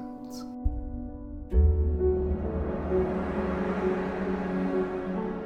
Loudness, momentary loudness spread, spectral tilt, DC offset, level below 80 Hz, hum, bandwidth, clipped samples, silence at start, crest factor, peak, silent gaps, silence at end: -29 LUFS; 14 LU; -9 dB/octave; under 0.1%; -32 dBFS; none; 6.8 kHz; under 0.1%; 0 s; 16 dB; -12 dBFS; none; 0 s